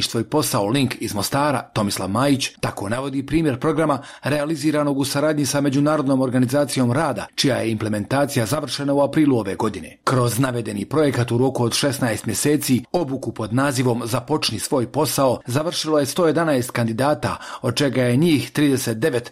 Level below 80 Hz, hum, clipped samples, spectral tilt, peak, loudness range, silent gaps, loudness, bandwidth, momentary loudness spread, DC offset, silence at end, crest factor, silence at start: -50 dBFS; none; under 0.1%; -5 dB/octave; -8 dBFS; 2 LU; none; -20 LUFS; 16 kHz; 5 LU; under 0.1%; 0 s; 12 dB; 0 s